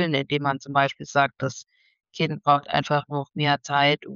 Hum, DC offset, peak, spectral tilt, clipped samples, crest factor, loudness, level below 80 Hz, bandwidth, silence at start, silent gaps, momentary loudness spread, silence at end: none; under 0.1%; -8 dBFS; -5 dB/octave; under 0.1%; 16 dB; -24 LUFS; -66 dBFS; 7.6 kHz; 0 s; none; 10 LU; 0 s